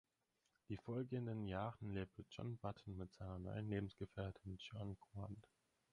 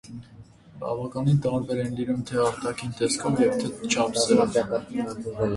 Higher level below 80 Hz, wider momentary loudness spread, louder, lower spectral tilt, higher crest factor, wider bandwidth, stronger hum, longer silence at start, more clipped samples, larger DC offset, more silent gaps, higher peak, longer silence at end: second, -66 dBFS vs -54 dBFS; second, 8 LU vs 11 LU; second, -50 LUFS vs -25 LUFS; first, -8 dB/octave vs -5 dB/octave; about the same, 18 dB vs 18 dB; about the same, 10.5 kHz vs 11.5 kHz; neither; first, 0.7 s vs 0.05 s; neither; neither; neither; second, -30 dBFS vs -8 dBFS; first, 0.5 s vs 0 s